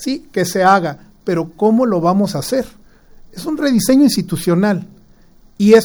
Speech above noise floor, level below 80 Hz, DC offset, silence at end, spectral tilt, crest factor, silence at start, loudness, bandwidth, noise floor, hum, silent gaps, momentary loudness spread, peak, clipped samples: 31 dB; -46 dBFS; under 0.1%; 0 s; -5.5 dB/octave; 16 dB; 0 s; -15 LUFS; over 20 kHz; -46 dBFS; none; none; 12 LU; 0 dBFS; under 0.1%